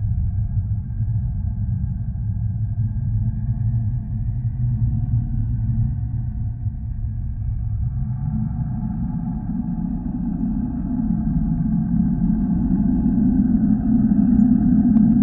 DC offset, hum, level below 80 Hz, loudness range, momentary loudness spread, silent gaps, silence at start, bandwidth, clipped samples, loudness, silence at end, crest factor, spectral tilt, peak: under 0.1%; none; -28 dBFS; 7 LU; 10 LU; none; 0 s; 2 kHz; under 0.1%; -22 LUFS; 0 s; 16 dB; -15 dB/octave; -4 dBFS